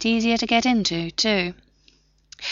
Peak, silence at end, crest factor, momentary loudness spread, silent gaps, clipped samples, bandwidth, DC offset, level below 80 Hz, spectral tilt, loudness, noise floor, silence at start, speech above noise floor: -6 dBFS; 0 s; 18 dB; 8 LU; none; under 0.1%; 7.6 kHz; under 0.1%; -52 dBFS; -2.5 dB/octave; -21 LUFS; -59 dBFS; 0 s; 38 dB